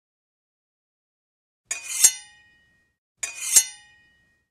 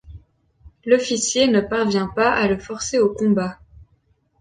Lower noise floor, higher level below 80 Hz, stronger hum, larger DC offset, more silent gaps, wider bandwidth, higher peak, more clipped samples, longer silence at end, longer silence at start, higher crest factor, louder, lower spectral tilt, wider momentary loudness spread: about the same, -63 dBFS vs -62 dBFS; second, -76 dBFS vs -48 dBFS; neither; neither; first, 2.98-3.15 s vs none; first, 16 kHz vs 9.8 kHz; first, 0 dBFS vs -4 dBFS; neither; first, 0.75 s vs 0.55 s; first, 1.7 s vs 0.1 s; first, 28 dB vs 18 dB; about the same, -19 LUFS vs -19 LUFS; second, 4 dB/octave vs -4 dB/octave; first, 15 LU vs 6 LU